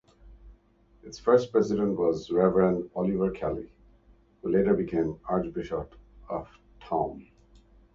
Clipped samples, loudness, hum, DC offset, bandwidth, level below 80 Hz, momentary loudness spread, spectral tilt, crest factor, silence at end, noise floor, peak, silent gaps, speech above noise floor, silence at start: under 0.1%; -28 LUFS; none; under 0.1%; 7.4 kHz; -52 dBFS; 14 LU; -8 dB/octave; 20 dB; 0.75 s; -61 dBFS; -8 dBFS; none; 34 dB; 0.25 s